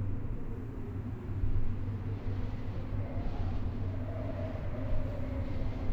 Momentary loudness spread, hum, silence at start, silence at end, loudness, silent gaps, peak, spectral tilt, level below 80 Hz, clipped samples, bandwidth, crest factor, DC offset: 4 LU; none; 0 s; 0 s; -38 LUFS; none; -20 dBFS; -9.5 dB/octave; -36 dBFS; under 0.1%; 5 kHz; 14 dB; under 0.1%